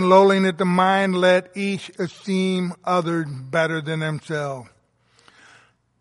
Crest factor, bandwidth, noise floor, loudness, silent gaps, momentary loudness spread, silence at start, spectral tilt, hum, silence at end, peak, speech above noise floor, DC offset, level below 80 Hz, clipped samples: 18 dB; 11.5 kHz; -60 dBFS; -21 LUFS; none; 10 LU; 0 s; -6 dB/octave; none; 1.35 s; -4 dBFS; 40 dB; under 0.1%; -68 dBFS; under 0.1%